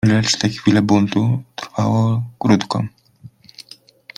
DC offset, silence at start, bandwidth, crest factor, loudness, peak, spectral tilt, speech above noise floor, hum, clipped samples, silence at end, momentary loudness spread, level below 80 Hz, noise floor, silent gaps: under 0.1%; 0.05 s; 11 kHz; 18 dB; -18 LUFS; 0 dBFS; -5.5 dB/octave; 27 dB; none; under 0.1%; 0.9 s; 13 LU; -52 dBFS; -44 dBFS; none